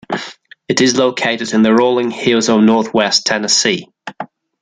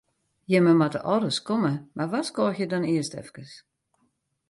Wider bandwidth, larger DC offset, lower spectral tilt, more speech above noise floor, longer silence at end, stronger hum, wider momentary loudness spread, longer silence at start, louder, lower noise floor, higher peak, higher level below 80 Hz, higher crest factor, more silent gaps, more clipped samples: second, 9.6 kHz vs 11.5 kHz; neither; second, -3 dB/octave vs -6 dB/octave; second, 21 dB vs 48 dB; second, 0.35 s vs 0.95 s; neither; first, 18 LU vs 14 LU; second, 0.1 s vs 0.5 s; first, -13 LUFS vs -25 LUFS; second, -34 dBFS vs -72 dBFS; first, 0 dBFS vs -8 dBFS; first, -58 dBFS vs -68 dBFS; about the same, 14 dB vs 18 dB; neither; neither